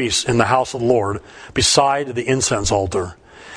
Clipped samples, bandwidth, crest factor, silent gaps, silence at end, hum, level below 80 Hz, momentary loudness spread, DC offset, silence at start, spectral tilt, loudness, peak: under 0.1%; 10.5 kHz; 18 dB; none; 0 s; none; -38 dBFS; 11 LU; under 0.1%; 0 s; -3.5 dB/octave; -18 LUFS; 0 dBFS